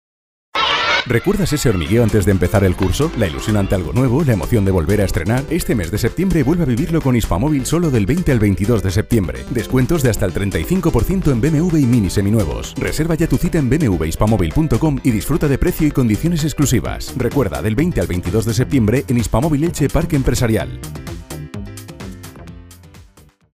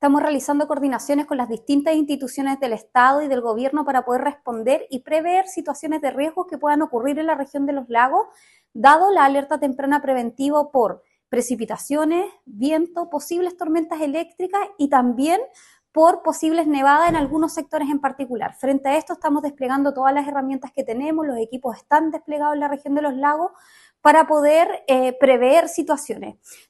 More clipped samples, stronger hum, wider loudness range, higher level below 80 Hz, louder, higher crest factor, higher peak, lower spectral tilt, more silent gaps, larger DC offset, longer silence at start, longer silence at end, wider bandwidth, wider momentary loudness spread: neither; neither; second, 2 LU vs 5 LU; first, -28 dBFS vs -58 dBFS; first, -17 LUFS vs -20 LUFS; about the same, 16 dB vs 18 dB; about the same, 0 dBFS vs 0 dBFS; first, -6 dB/octave vs -4 dB/octave; neither; neither; first, 0.55 s vs 0 s; first, 0.55 s vs 0.15 s; first, 16 kHz vs 12.5 kHz; second, 7 LU vs 10 LU